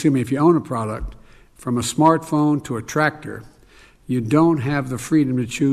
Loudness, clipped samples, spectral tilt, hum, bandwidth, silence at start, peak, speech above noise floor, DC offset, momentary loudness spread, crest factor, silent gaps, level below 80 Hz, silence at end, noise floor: -19 LUFS; under 0.1%; -6.5 dB/octave; none; 14.5 kHz; 0 s; -2 dBFS; 30 dB; under 0.1%; 15 LU; 18 dB; none; -44 dBFS; 0 s; -49 dBFS